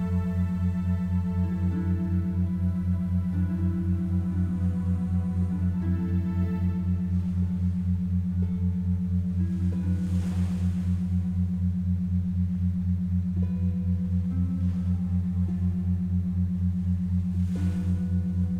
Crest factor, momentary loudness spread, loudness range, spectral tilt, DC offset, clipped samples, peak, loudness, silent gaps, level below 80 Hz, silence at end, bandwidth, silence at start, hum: 10 dB; 1 LU; 0 LU; -10 dB/octave; under 0.1%; under 0.1%; -16 dBFS; -27 LUFS; none; -40 dBFS; 0 s; 4 kHz; 0 s; none